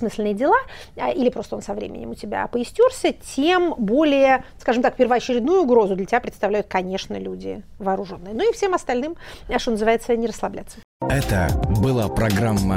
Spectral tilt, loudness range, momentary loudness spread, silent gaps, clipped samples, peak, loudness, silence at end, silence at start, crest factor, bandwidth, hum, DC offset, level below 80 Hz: -6 dB/octave; 5 LU; 12 LU; 10.84-11.00 s; under 0.1%; -4 dBFS; -21 LUFS; 0 s; 0 s; 16 dB; 16 kHz; none; under 0.1%; -36 dBFS